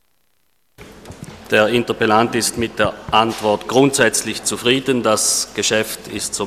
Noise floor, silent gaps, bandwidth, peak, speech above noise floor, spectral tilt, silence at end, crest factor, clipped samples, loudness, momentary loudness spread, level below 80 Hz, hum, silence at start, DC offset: -66 dBFS; none; 15.5 kHz; 0 dBFS; 49 dB; -3 dB/octave; 0 s; 18 dB; under 0.1%; -17 LUFS; 8 LU; -48 dBFS; none; 0.8 s; under 0.1%